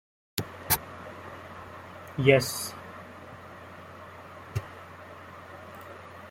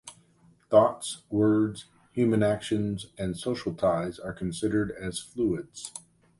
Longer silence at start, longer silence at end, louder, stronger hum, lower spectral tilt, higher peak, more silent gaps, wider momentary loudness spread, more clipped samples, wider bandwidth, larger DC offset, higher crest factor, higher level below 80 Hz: first, 0.35 s vs 0.05 s; second, 0 s vs 0.4 s; about the same, -28 LUFS vs -28 LUFS; neither; second, -4 dB/octave vs -6 dB/octave; about the same, -6 dBFS vs -8 dBFS; neither; first, 21 LU vs 15 LU; neither; first, 16.5 kHz vs 11.5 kHz; neither; first, 28 dB vs 20 dB; about the same, -60 dBFS vs -56 dBFS